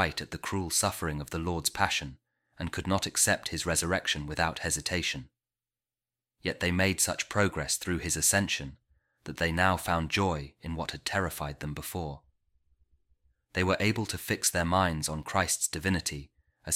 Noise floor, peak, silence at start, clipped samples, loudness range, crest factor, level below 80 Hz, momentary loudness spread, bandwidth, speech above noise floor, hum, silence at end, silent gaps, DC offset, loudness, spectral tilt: under -90 dBFS; -10 dBFS; 0 s; under 0.1%; 5 LU; 22 dB; -50 dBFS; 11 LU; 16.5 kHz; over 60 dB; none; 0 s; none; under 0.1%; -29 LUFS; -3 dB/octave